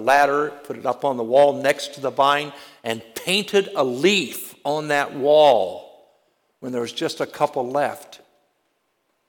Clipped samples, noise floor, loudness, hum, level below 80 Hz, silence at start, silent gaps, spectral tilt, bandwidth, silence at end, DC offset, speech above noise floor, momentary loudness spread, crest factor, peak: under 0.1%; -70 dBFS; -21 LUFS; none; -70 dBFS; 0 s; none; -3.5 dB/octave; 19 kHz; 1.1 s; under 0.1%; 50 dB; 13 LU; 16 dB; -6 dBFS